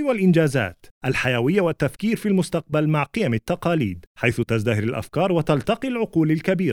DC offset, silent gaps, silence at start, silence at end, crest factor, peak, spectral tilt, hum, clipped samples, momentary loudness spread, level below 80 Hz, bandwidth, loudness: under 0.1%; 0.91-1.01 s, 4.07-4.15 s; 0 s; 0 s; 18 dB; -4 dBFS; -7 dB/octave; none; under 0.1%; 5 LU; -50 dBFS; 16.5 kHz; -22 LUFS